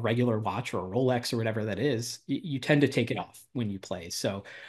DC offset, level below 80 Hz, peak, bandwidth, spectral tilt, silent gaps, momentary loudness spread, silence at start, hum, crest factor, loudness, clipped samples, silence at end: under 0.1%; -66 dBFS; -8 dBFS; 12.5 kHz; -5.5 dB/octave; none; 10 LU; 0 s; none; 20 dB; -30 LUFS; under 0.1%; 0 s